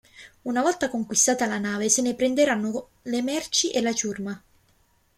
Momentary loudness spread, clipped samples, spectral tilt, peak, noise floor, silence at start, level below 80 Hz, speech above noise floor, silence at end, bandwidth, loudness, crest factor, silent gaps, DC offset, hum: 12 LU; under 0.1%; -2.5 dB/octave; -6 dBFS; -64 dBFS; 0.15 s; -62 dBFS; 39 dB; 0.8 s; 16 kHz; -24 LUFS; 18 dB; none; under 0.1%; none